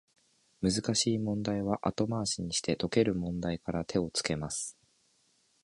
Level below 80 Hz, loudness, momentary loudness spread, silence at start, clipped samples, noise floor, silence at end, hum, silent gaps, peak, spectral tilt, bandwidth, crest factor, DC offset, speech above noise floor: -56 dBFS; -32 LUFS; 6 LU; 0.6 s; under 0.1%; -71 dBFS; 0.9 s; none; none; -10 dBFS; -4.5 dB/octave; 11.5 kHz; 22 dB; under 0.1%; 39 dB